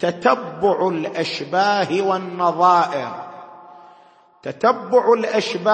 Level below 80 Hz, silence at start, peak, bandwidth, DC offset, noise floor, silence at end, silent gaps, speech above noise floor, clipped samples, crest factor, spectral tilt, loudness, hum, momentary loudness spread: -68 dBFS; 0 s; -2 dBFS; 8.8 kHz; under 0.1%; -51 dBFS; 0 s; none; 32 dB; under 0.1%; 18 dB; -5 dB/octave; -19 LUFS; none; 16 LU